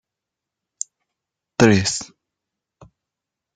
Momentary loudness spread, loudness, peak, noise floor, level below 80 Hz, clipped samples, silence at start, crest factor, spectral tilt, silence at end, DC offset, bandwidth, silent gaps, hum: 17 LU; -18 LUFS; -2 dBFS; -85 dBFS; -56 dBFS; under 0.1%; 1.6 s; 24 dB; -4.5 dB/octave; 1.5 s; under 0.1%; 9.6 kHz; none; none